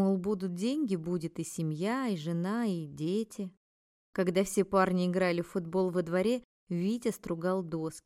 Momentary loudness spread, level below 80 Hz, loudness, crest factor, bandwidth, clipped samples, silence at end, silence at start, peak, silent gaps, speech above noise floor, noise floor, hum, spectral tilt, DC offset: 8 LU; -66 dBFS; -32 LUFS; 18 dB; 15.5 kHz; under 0.1%; 0.05 s; 0 s; -14 dBFS; 3.57-4.13 s, 6.45-6.67 s; over 59 dB; under -90 dBFS; none; -6.5 dB/octave; under 0.1%